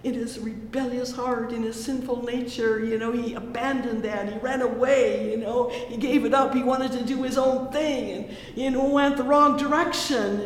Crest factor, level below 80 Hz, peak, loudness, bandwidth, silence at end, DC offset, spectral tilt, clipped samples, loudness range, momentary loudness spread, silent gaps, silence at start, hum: 18 dB; -52 dBFS; -6 dBFS; -25 LUFS; 16 kHz; 0 s; under 0.1%; -4.5 dB/octave; under 0.1%; 5 LU; 9 LU; none; 0 s; none